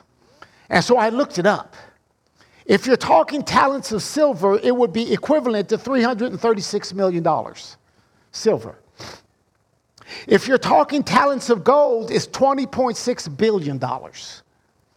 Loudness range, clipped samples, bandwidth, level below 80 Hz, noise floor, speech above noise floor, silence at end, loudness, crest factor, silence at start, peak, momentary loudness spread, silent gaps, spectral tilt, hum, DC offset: 6 LU; under 0.1%; 15 kHz; -58 dBFS; -65 dBFS; 46 dB; 0.6 s; -19 LUFS; 18 dB; 0.7 s; -2 dBFS; 19 LU; none; -5 dB/octave; none; under 0.1%